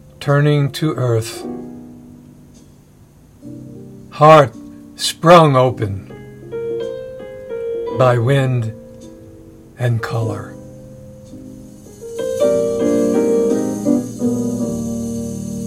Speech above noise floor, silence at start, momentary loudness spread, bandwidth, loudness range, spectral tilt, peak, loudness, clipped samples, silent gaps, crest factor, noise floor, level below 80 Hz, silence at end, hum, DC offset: 32 dB; 0.2 s; 26 LU; 16 kHz; 11 LU; -6.5 dB/octave; 0 dBFS; -16 LUFS; 0.1%; none; 18 dB; -46 dBFS; -50 dBFS; 0 s; none; under 0.1%